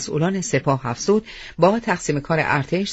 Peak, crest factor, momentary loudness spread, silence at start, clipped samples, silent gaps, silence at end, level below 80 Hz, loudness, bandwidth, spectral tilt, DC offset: -2 dBFS; 18 dB; 4 LU; 0 s; under 0.1%; none; 0 s; -48 dBFS; -21 LUFS; 8 kHz; -5 dB/octave; under 0.1%